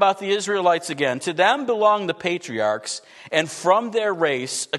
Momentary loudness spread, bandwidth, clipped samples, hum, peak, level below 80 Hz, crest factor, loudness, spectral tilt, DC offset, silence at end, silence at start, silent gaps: 6 LU; 12.5 kHz; under 0.1%; none; -4 dBFS; -74 dBFS; 18 dB; -21 LUFS; -3 dB/octave; under 0.1%; 0 s; 0 s; none